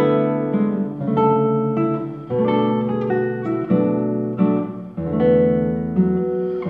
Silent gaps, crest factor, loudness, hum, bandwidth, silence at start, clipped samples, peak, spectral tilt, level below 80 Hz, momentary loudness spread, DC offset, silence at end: none; 14 dB; -20 LUFS; none; 4.2 kHz; 0 s; under 0.1%; -6 dBFS; -11 dB/octave; -50 dBFS; 7 LU; under 0.1%; 0 s